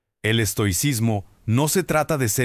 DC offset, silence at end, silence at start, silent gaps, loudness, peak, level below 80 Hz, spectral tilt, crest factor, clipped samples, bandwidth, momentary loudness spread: under 0.1%; 0 s; 0.25 s; none; -21 LUFS; -6 dBFS; -44 dBFS; -4.5 dB/octave; 16 dB; under 0.1%; 16 kHz; 4 LU